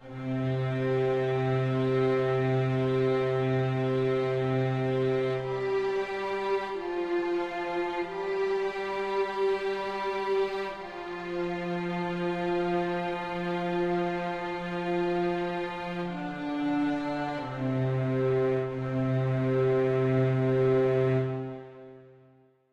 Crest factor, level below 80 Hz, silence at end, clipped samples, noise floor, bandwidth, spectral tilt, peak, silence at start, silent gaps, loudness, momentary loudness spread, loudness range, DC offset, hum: 14 dB; -58 dBFS; 0.6 s; under 0.1%; -61 dBFS; 8 kHz; -8 dB/octave; -14 dBFS; 0 s; none; -29 LUFS; 7 LU; 4 LU; under 0.1%; none